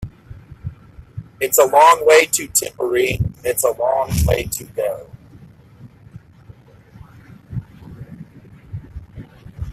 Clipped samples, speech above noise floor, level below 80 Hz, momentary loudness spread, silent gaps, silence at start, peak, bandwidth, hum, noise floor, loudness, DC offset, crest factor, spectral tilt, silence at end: under 0.1%; 29 dB; -36 dBFS; 27 LU; none; 0 s; 0 dBFS; 16 kHz; none; -45 dBFS; -16 LUFS; under 0.1%; 20 dB; -3.5 dB/octave; 0 s